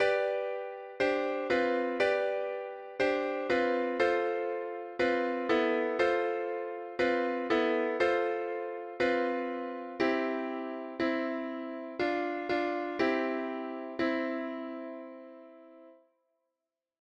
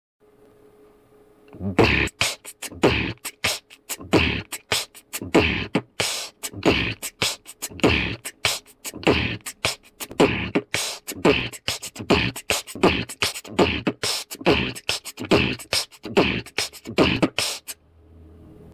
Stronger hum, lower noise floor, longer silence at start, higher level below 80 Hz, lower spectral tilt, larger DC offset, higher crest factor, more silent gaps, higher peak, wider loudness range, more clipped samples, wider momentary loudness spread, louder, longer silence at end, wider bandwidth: neither; first, -89 dBFS vs -54 dBFS; second, 0 s vs 1.55 s; second, -70 dBFS vs -40 dBFS; first, -5 dB/octave vs -3.5 dB/octave; neither; about the same, 16 dB vs 18 dB; neither; second, -16 dBFS vs -6 dBFS; about the same, 4 LU vs 2 LU; neither; about the same, 10 LU vs 11 LU; second, -32 LUFS vs -23 LUFS; first, 1.05 s vs 0 s; second, 9 kHz vs 16 kHz